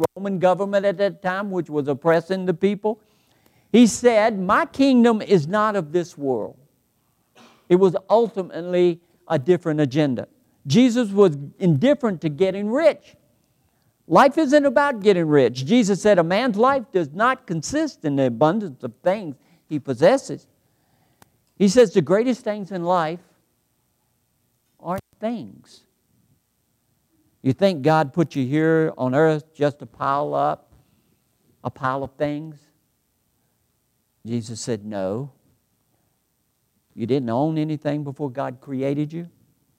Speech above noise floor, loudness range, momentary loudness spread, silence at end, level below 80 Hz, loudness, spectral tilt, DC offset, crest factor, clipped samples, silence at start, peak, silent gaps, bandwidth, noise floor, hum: 50 dB; 13 LU; 13 LU; 0.5 s; -62 dBFS; -20 LUFS; -6 dB/octave; under 0.1%; 18 dB; under 0.1%; 0 s; -4 dBFS; none; 15.5 kHz; -69 dBFS; none